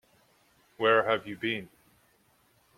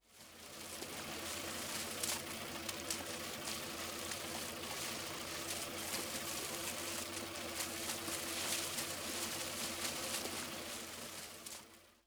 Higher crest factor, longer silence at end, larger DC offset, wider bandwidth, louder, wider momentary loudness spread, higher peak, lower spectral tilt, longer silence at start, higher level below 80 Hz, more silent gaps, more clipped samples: about the same, 22 dB vs 18 dB; first, 1.15 s vs 0.1 s; neither; second, 14.5 kHz vs over 20 kHz; first, -28 LUFS vs -41 LUFS; about the same, 9 LU vs 8 LU; first, -10 dBFS vs -24 dBFS; first, -5.5 dB/octave vs -1.5 dB/octave; first, 0.8 s vs 0.1 s; about the same, -72 dBFS vs -68 dBFS; neither; neither